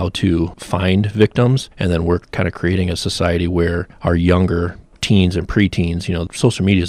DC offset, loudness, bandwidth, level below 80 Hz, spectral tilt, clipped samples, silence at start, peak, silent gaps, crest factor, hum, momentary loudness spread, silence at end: under 0.1%; -17 LUFS; 12.5 kHz; -36 dBFS; -6.5 dB/octave; under 0.1%; 0 s; -2 dBFS; none; 14 dB; none; 7 LU; 0 s